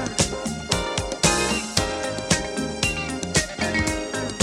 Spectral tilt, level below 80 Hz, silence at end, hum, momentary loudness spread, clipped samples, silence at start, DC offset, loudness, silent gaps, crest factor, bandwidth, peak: -3 dB/octave; -38 dBFS; 0 s; none; 7 LU; under 0.1%; 0 s; under 0.1%; -23 LUFS; none; 22 dB; 16.5 kHz; -2 dBFS